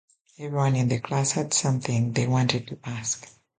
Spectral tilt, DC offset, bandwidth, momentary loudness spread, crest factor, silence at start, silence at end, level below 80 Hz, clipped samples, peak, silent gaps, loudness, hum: -4.5 dB/octave; under 0.1%; 9.6 kHz; 8 LU; 20 dB; 0.4 s; 0.35 s; -58 dBFS; under 0.1%; -6 dBFS; none; -25 LUFS; none